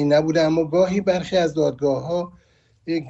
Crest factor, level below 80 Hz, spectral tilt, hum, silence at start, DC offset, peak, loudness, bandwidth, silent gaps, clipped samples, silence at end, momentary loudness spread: 14 dB; -54 dBFS; -6.5 dB/octave; none; 0 s; under 0.1%; -6 dBFS; -21 LUFS; 8 kHz; none; under 0.1%; 0 s; 9 LU